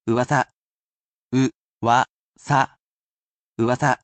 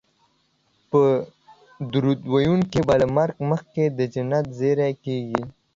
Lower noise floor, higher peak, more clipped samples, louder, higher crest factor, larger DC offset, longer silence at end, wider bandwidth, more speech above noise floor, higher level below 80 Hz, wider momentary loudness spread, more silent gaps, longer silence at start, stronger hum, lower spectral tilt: first, under -90 dBFS vs -66 dBFS; second, -6 dBFS vs -2 dBFS; neither; about the same, -22 LUFS vs -22 LUFS; about the same, 18 dB vs 20 dB; neither; second, 0.05 s vs 0.25 s; first, 8.8 kHz vs 7.6 kHz; first, over 70 dB vs 45 dB; second, -62 dBFS vs -52 dBFS; about the same, 8 LU vs 8 LU; first, 0.55-1.30 s, 1.55-1.81 s, 2.09-2.33 s, 2.79-3.55 s vs none; second, 0.05 s vs 0.95 s; neither; second, -6 dB/octave vs -8 dB/octave